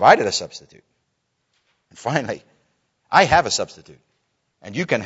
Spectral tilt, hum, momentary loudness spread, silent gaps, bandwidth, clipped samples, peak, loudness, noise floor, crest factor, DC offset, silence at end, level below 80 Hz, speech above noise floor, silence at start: -3.5 dB/octave; none; 18 LU; none; 8 kHz; under 0.1%; 0 dBFS; -19 LUFS; -73 dBFS; 22 dB; under 0.1%; 0 s; -50 dBFS; 53 dB; 0 s